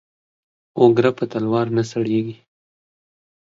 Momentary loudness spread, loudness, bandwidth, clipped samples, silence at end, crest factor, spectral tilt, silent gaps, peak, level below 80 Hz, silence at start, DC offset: 11 LU; -19 LUFS; 7.8 kHz; under 0.1%; 1.1 s; 20 dB; -7.5 dB/octave; none; -2 dBFS; -64 dBFS; 0.75 s; under 0.1%